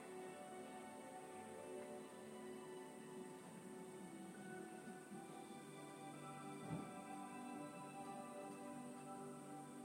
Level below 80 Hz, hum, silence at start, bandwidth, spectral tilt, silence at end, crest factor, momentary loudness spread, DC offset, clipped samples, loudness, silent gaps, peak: under -90 dBFS; none; 0 s; 16 kHz; -5 dB/octave; 0 s; 18 dB; 3 LU; under 0.1%; under 0.1%; -54 LUFS; none; -36 dBFS